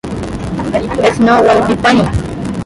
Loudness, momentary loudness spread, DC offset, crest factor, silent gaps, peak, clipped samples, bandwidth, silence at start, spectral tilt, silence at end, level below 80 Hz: -12 LUFS; 11 LU; under 0.1%; 12 dB; none; 0 dBFS; under 0.1%; 11.5 kHz; 0.05 s; -6 dB/octave; 0 s; -30 dBFS